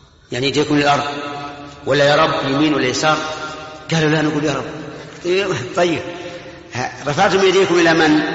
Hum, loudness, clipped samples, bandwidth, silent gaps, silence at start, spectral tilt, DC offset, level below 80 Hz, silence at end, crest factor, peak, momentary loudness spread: none; -16 LUFS; under 0.1%; 8 kHz; none; 0.3 s; -3.5 dB/octave; under 0.1%; -50 dBFS; 0 s; 16 dB; -2 dBFS; 16 LU